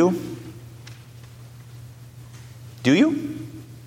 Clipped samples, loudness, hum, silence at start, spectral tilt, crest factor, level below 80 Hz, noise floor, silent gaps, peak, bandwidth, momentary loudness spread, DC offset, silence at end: under 0.1%; -22 LUFS; none; 0 s; -6 dB/octave; 20 dB; -58 dBFS; -43 dBFS; none; -6 dBFS; 16.5 kHz; 25 LU; under 0.1%; 0 s